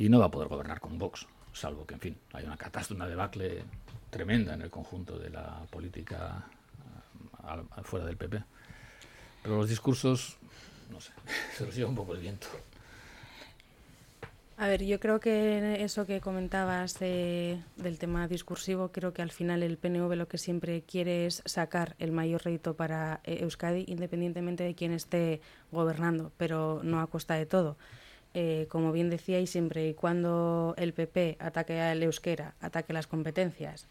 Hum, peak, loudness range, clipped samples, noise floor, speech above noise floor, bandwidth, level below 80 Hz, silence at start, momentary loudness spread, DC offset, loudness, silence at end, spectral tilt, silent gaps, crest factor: none; -10 dBFS; 9 LU; under 0.1%; -58 dBFS; 25 dB; 16 kHz; -54 dBFS; 0 s; 20 LU; under 0.1%; -33 LUFS; 0.1 s; -6 dB/octave; none; 22 dB